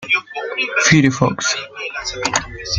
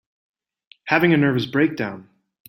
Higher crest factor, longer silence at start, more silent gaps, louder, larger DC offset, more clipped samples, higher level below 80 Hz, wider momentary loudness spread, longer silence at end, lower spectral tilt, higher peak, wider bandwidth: about the same, 18 dB vs 20 dB; second, 0 s vs 0.85 s; neither; first, -17 LUFS vs -20 LUFS; neither; neither; first, -44 dBFS vs -62 dBFS; second, 12 LU vs 18 LU; second, 0 s vs 0.45 s; second, -3.5 dB/octave vs -7.5 dB/octave; about the same, 0 dBFS vs -2 dBFS; second, 9.6 kHz vs 16.5 kHz